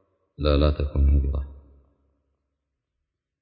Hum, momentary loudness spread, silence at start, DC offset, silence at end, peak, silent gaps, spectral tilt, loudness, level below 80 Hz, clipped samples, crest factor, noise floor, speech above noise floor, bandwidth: none; 10 LU; 0.4 s; under 0.1%; 1.8 s; -6 dBFS; none; -11.5 dB/octave; -24 LUFS; -26 dBFS; under 0.1%; 20 dB; -82 dBFS; 61 dB; 5 kHz